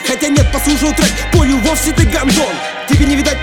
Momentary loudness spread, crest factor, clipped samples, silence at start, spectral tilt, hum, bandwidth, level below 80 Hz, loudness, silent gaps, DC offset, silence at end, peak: 2 LU; 12 dB; under 0.1%; 0 s; -4.5 dB/octave; none; 19 kHz; -20 dBFS; -12 LUFS; none; under 0.1%; 0 s; 0 dBFS